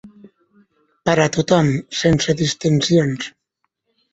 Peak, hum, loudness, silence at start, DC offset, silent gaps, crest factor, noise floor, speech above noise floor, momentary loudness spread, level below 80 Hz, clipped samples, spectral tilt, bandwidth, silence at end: -2 dBFS; none; -18 LUFS; 0.05 s; under 0.1%; none; 18 dB; -73 dBFS; 57 dB; 9 LU; -48 dBFS; under 0.1%; -5 dB/octave; 8.2 kHz; 0.85 s